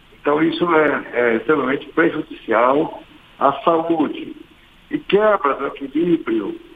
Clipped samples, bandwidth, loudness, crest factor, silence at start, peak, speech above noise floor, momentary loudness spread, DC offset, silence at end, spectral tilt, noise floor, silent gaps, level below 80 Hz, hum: under 0.1%; 4.8 kHz; -18 LUFS; 18 dB; 0.25 s; 0 dBFS; 27 dB; 11 LU; under 0.1%; 0.2 s; -8 dB/octave; -45 dBFS; none; -54 dBFS; none